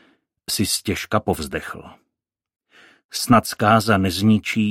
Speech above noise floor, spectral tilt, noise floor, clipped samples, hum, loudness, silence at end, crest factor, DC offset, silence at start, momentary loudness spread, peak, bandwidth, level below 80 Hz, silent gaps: 62 dB; -4.5 dB/octave; -82 dBFS; under 0.1%; none; -20 LUFS; 0 s; 20 dB; under 0.1%; 0.5 s; 14 LU; 0 dBFS; 16.5 kHz; -48 dBFS; 3.04-3.09 s